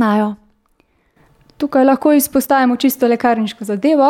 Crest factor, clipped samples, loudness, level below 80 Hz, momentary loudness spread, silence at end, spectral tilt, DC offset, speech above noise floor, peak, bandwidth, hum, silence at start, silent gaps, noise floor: 14 dB; under 0.1%; -15 LUFS; -56 dBFS; 9 LU; 0 s; -5 dB/octave; under 0.1%; 45 dB; -2 dBFS; 17.5 kHz; none; 0 s; none; -59 dBFS